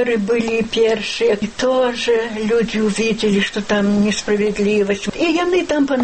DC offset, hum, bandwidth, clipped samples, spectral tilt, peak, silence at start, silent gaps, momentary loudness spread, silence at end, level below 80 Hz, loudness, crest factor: under 0.1%; none; 8.8 kHz; under 0.1%; -5 dB/octave; -6 dBFS; 0 s; none; 2 LU; 0 s; -46 dBFS; -17 LUFS; 12 dB